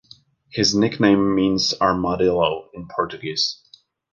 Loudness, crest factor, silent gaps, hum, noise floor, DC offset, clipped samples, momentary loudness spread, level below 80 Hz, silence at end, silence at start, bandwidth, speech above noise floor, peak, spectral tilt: -20 LUFS; 18 dB; none; none; -51 dBFS; under 0.1%; under 0.1%; 12 LU; -50 dBFS; 0.6 s; 0.55 s; 7.4 kHz; 32 dB; -2 dBFS; -4.5 dB/octave